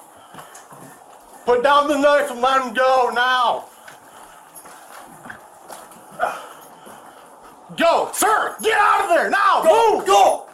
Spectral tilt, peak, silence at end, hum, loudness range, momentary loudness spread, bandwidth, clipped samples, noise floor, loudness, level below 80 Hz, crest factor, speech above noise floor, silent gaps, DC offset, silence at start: -2 dB/octave; -4 dBFS; 0.1 s; none; 16 LU; 24 LU; 16.5 kHz; under 0.1%; -44 dBFS; -17 LUFS; -60 dBFS; 16 dB; 28 dB; none; under 0.1%; 0.35 s